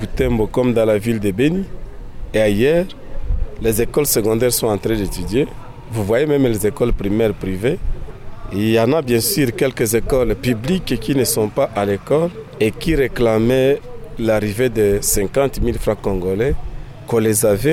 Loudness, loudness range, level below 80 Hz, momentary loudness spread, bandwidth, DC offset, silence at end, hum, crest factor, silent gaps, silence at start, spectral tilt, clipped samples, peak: -18 LUFS; 2 LU; -28 dBFS; 12 LU; 17 kHz; under 0.1%; 0 s; none; 12 dB; none; 0 s; -5 dB/octave; under 0.1%; -4 dBFS